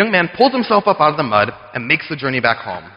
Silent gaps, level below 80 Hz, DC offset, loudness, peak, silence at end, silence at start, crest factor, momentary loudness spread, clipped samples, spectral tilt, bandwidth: none; -54 dBFS; under 0.1%; -16 LUFS; 0 dBFS; 0.05 s; 0 s; 16 dB; 7 LU; under 0.1%; -8 dB/octave; 5.6 kHz